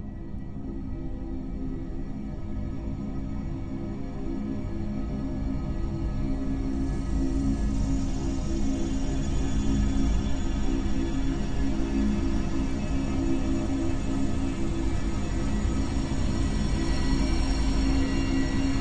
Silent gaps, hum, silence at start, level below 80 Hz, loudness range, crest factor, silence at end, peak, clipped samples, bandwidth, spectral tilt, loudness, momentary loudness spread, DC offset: none; none; 0 s; -30 dBFS; 6 LU; 14 dB; 0 s; -12 dBFS; under 0.1%; 9.4 kHz; -6.5 dB/octave; -30 LUFS; 9 LU; 1%